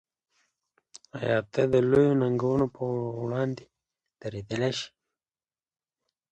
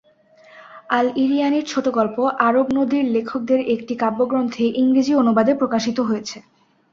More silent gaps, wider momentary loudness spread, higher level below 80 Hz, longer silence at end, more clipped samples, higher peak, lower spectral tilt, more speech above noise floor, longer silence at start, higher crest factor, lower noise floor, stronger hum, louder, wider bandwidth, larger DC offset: neither; first, 17 LU vs 6 LU; about the same, -60 dBFS vs -62 dBFS; first, 1.45 s vs 0.5 s; neither; second, -10 dBFS vs -2 dBFS; first, -7 dB/octave vs -5.5 dB/octave; first, over 64 dB vs 33 dB; first, 0.95 s vs 0.55 s; about the same, 18 dB vs 18 dB; first, under -90 dBFS vs -51 dBFS; neither; second, -27 LUFS vs -19 LUFS; first, 9 kHz vs 7.4 kHz; neither